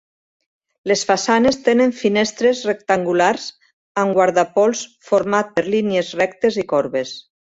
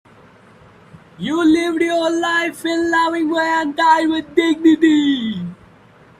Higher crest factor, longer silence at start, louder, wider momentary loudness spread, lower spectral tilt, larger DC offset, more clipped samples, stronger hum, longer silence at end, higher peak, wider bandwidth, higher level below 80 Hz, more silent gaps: about the same, 16 dB vs 16 dB; second, 0.85 s vs 1.2 s; about the same, -18 LUFS vs -16 LUFS; about the same, 10 LU vs 9 LU; about the same, -4 dB/octave vs -4.5 dB/octave; neither; neither; neither; second, 0.35 s vs 0.65 s; about the same, -2 dBFS vs 0 dBFS; second, 8 kHz vs 13.5 kHz; about the same, -58 dBFS vs -58 dBFS; first, 3.73-3.95 s vs none